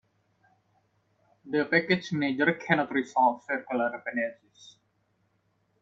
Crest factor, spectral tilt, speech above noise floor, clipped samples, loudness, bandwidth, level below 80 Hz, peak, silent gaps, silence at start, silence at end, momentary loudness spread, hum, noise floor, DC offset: 22 dB; -6 dB/octave; 44 dB; under 0.1%; -27 LUFS; 7.8 kHz; -74 dBFS; -8 dBFS; none; 1.45 s; 1.15 s; 7 LU; none; -72 dBFS; under 0.1%